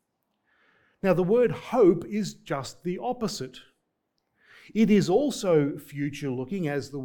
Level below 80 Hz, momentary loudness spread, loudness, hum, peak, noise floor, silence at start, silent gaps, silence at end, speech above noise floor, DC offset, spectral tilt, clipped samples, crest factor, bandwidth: -60 dBFS; 12 LU; -26 LUFS; none; -10 dBFS; -78 dBFS; 1.05 s; none; 0 s; 53 dB; under 0.1%; -6.5 dB/octave; under 0.1%; 18 dB; 19 kHz